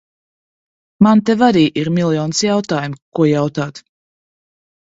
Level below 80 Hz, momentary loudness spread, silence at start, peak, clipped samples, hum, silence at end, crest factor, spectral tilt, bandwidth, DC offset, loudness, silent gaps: -56 dBFS; 10 LU; 1 s; 0 dBFS; under 0.1%; none; 1.1 s; 16 dB; -5.5 dB/octave; 8 kHz; under 0.1%; -15 LUFS; 3.02-3.12 s